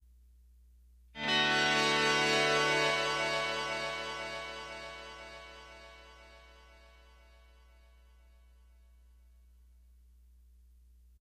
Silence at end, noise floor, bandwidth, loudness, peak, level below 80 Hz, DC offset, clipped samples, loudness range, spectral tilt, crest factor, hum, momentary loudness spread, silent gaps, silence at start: 4.8 s; -60 dBFS; 13.5 kHz; -30 LUFS; -16 dBFS; -60 dBFS; under 0.1%; under 0.1%; 21 LU; -2.5 dB/octave; 20 dB; none; 24 LU; none; 1.15 s